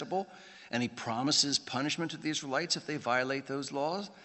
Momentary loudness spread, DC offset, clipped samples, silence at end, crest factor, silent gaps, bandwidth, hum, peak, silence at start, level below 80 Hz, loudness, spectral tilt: 10 LU; under 0.1%; under 0.1%; 0 s; 20 dB; none; 8.4 kHz; none; -14 dBFS; 0 s; -78 dBFS; -32 LUFS; -3 dB/octave